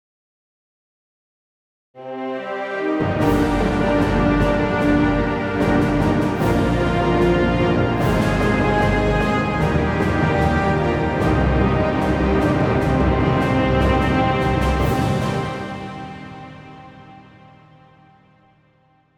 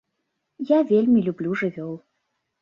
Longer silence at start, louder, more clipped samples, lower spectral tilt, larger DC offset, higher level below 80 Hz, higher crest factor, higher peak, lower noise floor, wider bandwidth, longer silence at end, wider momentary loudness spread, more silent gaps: first, 1.95 s vs 0.6 s; about the same, -19 LUFS vs -21 LUFS; neither; second, -7.5 dB/octave vs -9 dB/octave; neither; first, -30 dBFS vs -68 dBFS; about the same, 16 dB vs 16 dB; first, -4 dBFS vs -8 dBFS; second, -58 dBFS vs -77 dBFS; first, over 20 kHz vs 6.6 kHz; first, 1.95 s vs 0.65 s; second, 10 LU vs 17 LU; neither